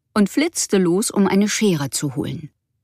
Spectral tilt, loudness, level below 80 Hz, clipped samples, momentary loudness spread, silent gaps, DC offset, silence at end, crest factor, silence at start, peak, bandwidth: -4.5 dB/octave; -19 LUFS; -58 dBFS; under 0.1%; 9 LU; none; under 0.1%; 0.35 s; 14 dB; 0.15 s; -6 dBFS; 15.5 kHz